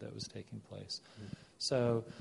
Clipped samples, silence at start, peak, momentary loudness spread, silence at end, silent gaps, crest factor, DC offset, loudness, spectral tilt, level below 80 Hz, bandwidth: under 0.1%; 0 s; -18 dBFS; 17 LU; 0 s; none; 20 dB; under 0.1%; -38 LUFS; -5 dB/octave; -68 dBFS; 11.5 kHz